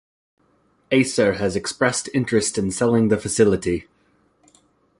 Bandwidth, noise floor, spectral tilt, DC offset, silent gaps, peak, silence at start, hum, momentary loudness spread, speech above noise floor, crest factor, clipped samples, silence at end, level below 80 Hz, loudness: 11.5 kHz; -62 dBFS; -4.5 dB/octave; under 0.1%; none; -2 dBFS; 0.9 s; none; 5 LU; 42 dB; 20 dB; under 0.1%; 1.2 s; -48 dBFS; -20 LUFS